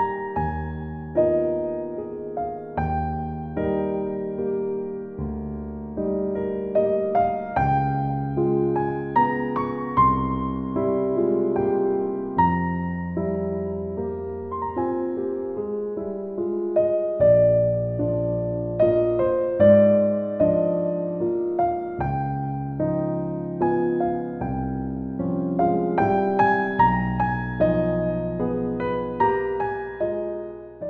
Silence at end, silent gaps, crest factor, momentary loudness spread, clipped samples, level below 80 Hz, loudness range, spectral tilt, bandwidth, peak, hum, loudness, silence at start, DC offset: 0 s; none; 18 dB; 10 LU; under 0.1%; -42 dBFS; 7 LU; -11 dB/octave; 4.5 kHz; -6 dBFS; none; -24 LUFS; 0 s; under 0.1%